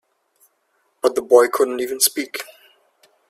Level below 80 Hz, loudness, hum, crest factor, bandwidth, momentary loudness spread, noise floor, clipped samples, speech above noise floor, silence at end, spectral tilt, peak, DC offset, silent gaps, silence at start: -68 dBFS; -18 LUFS; none; 22 dB; 16 kHz; 15 LU; -67 dBFS; under 0.1%; 49 dB; 0.85 s; -0.5 dB/octave; 0 dBFS; under 0.1%; none; 1.05 s